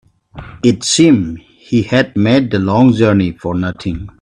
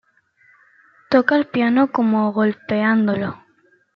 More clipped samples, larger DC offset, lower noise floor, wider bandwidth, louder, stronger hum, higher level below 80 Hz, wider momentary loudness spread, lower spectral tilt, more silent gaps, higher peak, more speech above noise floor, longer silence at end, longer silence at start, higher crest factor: neither; neither; second, -34 dBFS vs -59 dBFS; first, 11 kHz vs 5.8 kHz; first, -13 LUFS vs -18 LUFS; neither; first, -42 dBFS vs -64 dBFS; first, 12 LU vs 5 LU; second, -5.5 dB/octave vs -8.5 dB/octave; neither; about the same, 0 dBFS vs -2 dBFS; second, 22 dB vs 41 dB; second, 0.1 s vs 0.6 s; second, 0.35 s vs 1.1 s; about the same, 14 dB vs 18 dB